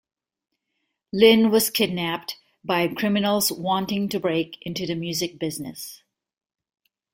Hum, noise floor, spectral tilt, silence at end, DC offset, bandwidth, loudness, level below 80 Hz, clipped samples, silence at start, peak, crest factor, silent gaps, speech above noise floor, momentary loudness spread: none; -78 dBFS; -4 dB/octave; 1.2 s; under 0.1%; 16.5 kHz; -22 LUFS; -62 dBFS; under 0.1%; 1.15 s; -2 dBFS; 22 dB; none; 55 dB; 16 LU